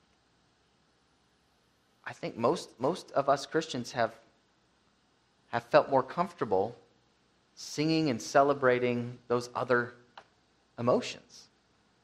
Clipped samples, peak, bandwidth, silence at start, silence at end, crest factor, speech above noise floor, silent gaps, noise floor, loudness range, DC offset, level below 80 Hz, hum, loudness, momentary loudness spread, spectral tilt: under 0.1%; -8 dBFS; 13.5 kHz; 2.05 s; 0.65 s; 24 dB; 40 dB; none; -70 dBFS; 4 LU; under 0.1%; -72 dBFS; none; -30 LUFS; 14 LU; -5 dB/octave